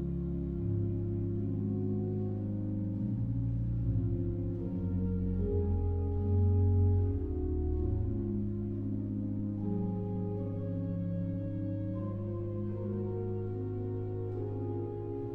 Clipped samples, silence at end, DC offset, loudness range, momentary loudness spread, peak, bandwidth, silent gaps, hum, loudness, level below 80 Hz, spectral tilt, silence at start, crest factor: under 0.1%; 0 s; 0.1%; 5 LU; 6 LU; -20 dBFS; 2.4 kHz; none; none; -34 LUFS; -42 dBFS; -13 dB/octave; 0 s; 14 dB